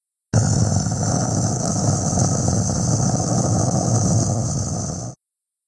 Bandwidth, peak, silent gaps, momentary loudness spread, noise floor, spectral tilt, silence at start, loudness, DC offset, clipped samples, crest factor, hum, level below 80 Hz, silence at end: 10.5 kHz; -4 dBFS; none; 5 LU; -83 dBFS; -5.5 dB/octave; 0.35 s; -20 LUFS; under 0.1%; under 0.1%; 16 dB; none; -38 dBFS; 0.55 s